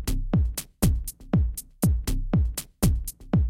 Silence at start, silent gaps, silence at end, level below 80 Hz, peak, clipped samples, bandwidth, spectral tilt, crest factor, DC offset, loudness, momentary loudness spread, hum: 0 s; none; 0 s; -28 dBFS; -8 dBFS; under 0.1%; 17 kHz; -6 dB/octave; 16 dB; under 0.1%; -27 LUFS; 5 LU; none